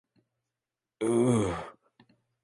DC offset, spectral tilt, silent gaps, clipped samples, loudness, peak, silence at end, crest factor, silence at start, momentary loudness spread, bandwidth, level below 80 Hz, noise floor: under 0.1%; -6.5 dB/octave; none; under 0.1%; -28 LUFS; -12 dBFS; 0.7 s; 20 dB; 1 s; 15 LU; 11.5 kHz; -56 dBFS; -90 dBFS